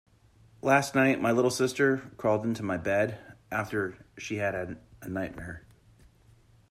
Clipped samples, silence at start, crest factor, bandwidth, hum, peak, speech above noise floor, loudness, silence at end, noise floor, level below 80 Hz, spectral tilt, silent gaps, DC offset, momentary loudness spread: under 0.1%; 0.65 s; 20 dB; 15 kHz; none; -10 dBFS; 31 dB; -28 LUFS; 1.1 s; -60 dBFS; -60 dBFS; -5.5 dB/octave; none; under 0.1%; 17 LU